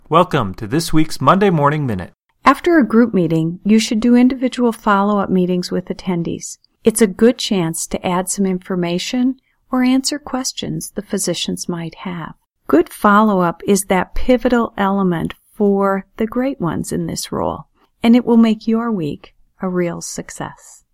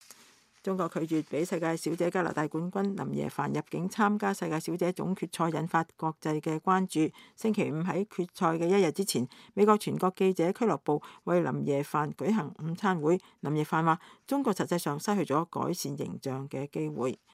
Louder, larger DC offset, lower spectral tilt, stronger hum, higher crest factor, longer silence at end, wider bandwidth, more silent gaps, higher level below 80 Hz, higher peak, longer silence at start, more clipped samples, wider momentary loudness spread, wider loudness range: first, -17 LUFS vs -30 LUFS; neither; about the same, -5.5 dB/octave vs -6 dB/octave; neither; about the same, 16 dB vs 20 dB; first, 0.4 s vs 0.2 s; about the same, 16 kHz vs 15.5 kHz; neither; first, -38 dBFS vs -76 dBFS; first, 0 dBFS vs -10 dBFS; second, 0.1 s vs 0.65 s; neither; first, 13 LU vs 7 LU; about the same, 5 LU vs 3 LU